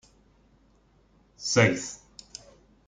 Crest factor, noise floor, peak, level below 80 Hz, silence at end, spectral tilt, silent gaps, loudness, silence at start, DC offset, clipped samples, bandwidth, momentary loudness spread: 26 dB; -62 dBFS; -6 dBFS; -62 dBFS; 0.9 s; -4 dB/octave; none; -25 LUFS; 1.4 s; under 0.1%; under 0.1%; 9.6 kHz; 24 LU